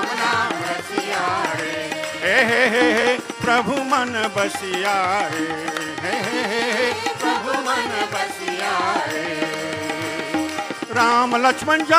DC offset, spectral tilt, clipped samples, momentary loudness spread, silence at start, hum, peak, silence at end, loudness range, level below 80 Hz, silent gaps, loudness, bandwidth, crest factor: under 0.1%; -3 dB/octave; under 0.1%; 8 LU; 0 s; none; 0 dBFS; 0 s; 4 LU; -64 dBFS; none; -20 LUFS; 15.5 kHz; 20 dB